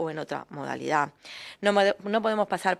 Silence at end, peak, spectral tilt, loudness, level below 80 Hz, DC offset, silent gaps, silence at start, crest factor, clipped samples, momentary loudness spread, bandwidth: 0 s; -8 dBFS; -4.5 dB/octave; -27 LUFS; -72 dBFS; under 0.1%; none; 0 s; 20 dB; under 0.1%; 12 LU; 13.5 kHz